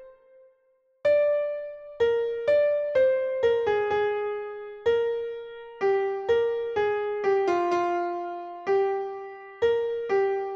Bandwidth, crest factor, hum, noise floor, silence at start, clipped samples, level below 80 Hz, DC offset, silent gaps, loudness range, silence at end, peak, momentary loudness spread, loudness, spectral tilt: 7.2 kHz; 14 dB; none; -67 dBFS; 0 s; under 0.1%; -62 dBFS; under 0.1%; none; 2 LU; 0 s; -12 dBFS; 12 LU; -26 LUFS; -5.5 dB/octave